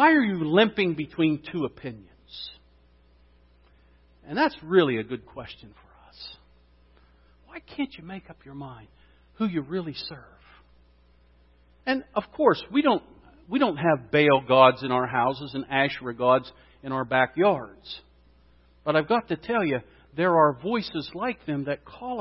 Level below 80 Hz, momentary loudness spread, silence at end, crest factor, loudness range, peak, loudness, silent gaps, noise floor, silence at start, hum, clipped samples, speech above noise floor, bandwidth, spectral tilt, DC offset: -58 dBFS; 21 LU; 0 s; 24 dB; 14 LU; -2 dBFS; -25 LUFS; none; -58 dBFS; 0 s; 60 Hz at -60 dBFS; under 0.1%; 34 dB; 5.8 kHz; -10 dB/octave; under 0.1%